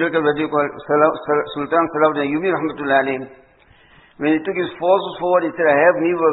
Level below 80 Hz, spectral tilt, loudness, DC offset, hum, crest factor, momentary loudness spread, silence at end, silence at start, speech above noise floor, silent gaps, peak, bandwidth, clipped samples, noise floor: -58 dBFS; -11 dB/octave; -18 LUFS; under 0.1%; none; 18 dB; 7 LU; 0 s; 0 s; 33 dB; none; 0 dBFS; 4.1 kHz; under 0.1%; -51 dBFS